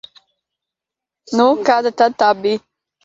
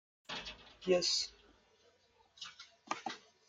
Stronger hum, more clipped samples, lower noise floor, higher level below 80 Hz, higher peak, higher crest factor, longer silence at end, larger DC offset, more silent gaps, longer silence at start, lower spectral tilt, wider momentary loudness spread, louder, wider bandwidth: neither; neither; first, -86 dBFS vs -70 dBFS; first, -66 dBFS vs -72 dBFS; first, 0 dBFS vs -20 dBFS; about the same, 18 dB vs 22 dB; first, 0.45 s vs 0.3 s; neither; neither; first, 1.3 s vs 0.3 s; first, -4.5 dB/octave vs -2.5 dB/octave; second, 8 LU vs 19 LU; first, -16 LUFS vs -37 LUFS; second, 7.8 kHz vs 9.6 kHz